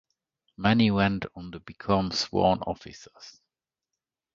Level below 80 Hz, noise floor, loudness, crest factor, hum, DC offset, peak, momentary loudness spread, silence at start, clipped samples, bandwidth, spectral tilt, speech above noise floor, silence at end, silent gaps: -52 dBFS; -88 dBFS; -25 LUFS; 22 dB; none; under 0.1%; -6 dBFS; 21 LU; 0.6 s; under 0.1%; 7.6 kHz; -6 dB/octave; 61 dB; 1.05 s; none